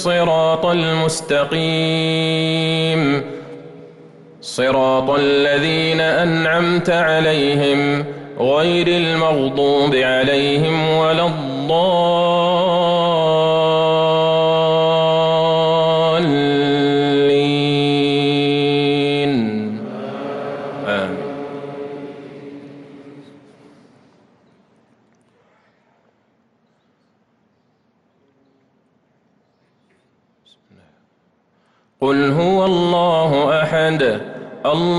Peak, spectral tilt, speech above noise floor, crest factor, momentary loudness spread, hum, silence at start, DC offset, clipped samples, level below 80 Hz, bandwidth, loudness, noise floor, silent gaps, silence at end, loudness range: -6 dBFS; -5.5 dB/octave; 46 dB; 12 dB; 12 LU; none; 0 s; under 0.1%; under 0.1%; -54 dBFS; 12 kHz; -16 LUFS; -61 dBFS; none; 0 s; 11 LU